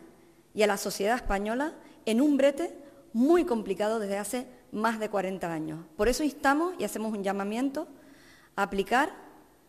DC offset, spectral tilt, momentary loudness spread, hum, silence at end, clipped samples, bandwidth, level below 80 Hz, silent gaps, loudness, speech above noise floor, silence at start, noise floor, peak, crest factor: under 0.1%; -4.5 dB/octave; 12 LU; none; 0.35 s; under 0.1%; 14.5 kHz; -48 dBFS; none; -29 LUFS; 28 dB; 0 s; -56 dBFS; -10 dBFS; 18 dB